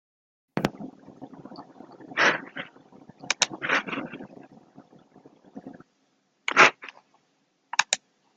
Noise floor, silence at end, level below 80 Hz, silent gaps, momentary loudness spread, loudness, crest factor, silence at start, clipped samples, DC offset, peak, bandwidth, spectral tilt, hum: -70 dBFS; 0.4 s; -70 dBFS; none; 27 LU; -24 LUFS; 28 dB; 0.55 s; under 0.1%; under 0.1%; -2 dBFS; 13.5 kHz; -1.5 dB/octave; none